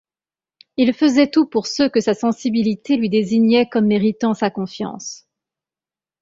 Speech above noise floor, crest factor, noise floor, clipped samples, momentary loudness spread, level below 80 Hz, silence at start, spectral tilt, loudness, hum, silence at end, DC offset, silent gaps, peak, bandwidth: over 73 dB; 16 dB; under -90 dBFS; under 0.1%; 12 LU; -60 dBFS; 0.8 s; -5.5 dB/octave; -18 LUFS; none; 1.05 s; under 0.1%; none; -2 dBFS; 7.6 kHz